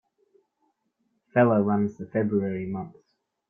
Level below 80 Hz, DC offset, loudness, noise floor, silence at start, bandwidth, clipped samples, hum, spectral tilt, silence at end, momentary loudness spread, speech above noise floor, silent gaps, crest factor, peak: -66 dBFS; under 0.1%; -25 LUFS; -74 dBFS; 1.35 s; 3.5 kHz; under 0.1%; none; -10.5 dB/octave; 0.6 s; 13 LU; 50 dB; none; 20 dB; -8 dBFS